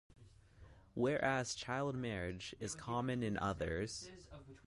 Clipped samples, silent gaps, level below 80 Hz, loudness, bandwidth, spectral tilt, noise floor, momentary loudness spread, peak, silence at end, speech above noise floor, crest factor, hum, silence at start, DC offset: under 0.1%; none; -60 dBFS; -40 LUFS; 11.5 kHz; -5 dB/octave; -61 dBFS; 13 LU; -22 dBFS; 0.1 s; 21 dB; 20 dB; none; 0.2 s; under 0.1%